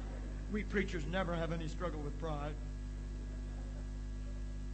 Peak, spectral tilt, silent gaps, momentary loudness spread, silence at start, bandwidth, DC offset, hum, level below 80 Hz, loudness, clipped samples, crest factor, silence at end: -20 dBFS; -6.5 dB/octave; none; 8 LU; 0 s; 8.4 kHz; under 0.1%; 50 Hz at -40 dBFS; -42 dBFS; -41 LUFS; under 0.1%; 20 dB; 0 s